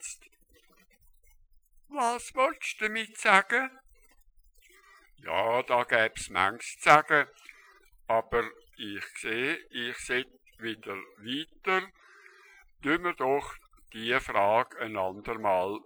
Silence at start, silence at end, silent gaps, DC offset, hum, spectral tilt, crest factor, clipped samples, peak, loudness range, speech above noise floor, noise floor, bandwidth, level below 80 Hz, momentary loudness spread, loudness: 0 s; 0.05 s; none; under 0.1%; none; -3 dB/octave; 28 dB; under 0.1%; -4 dBFS; 7 LU; 34 dB; -63 dBFS; over 20 kHz; -60 dBFS; 17 LU; -28 LUFS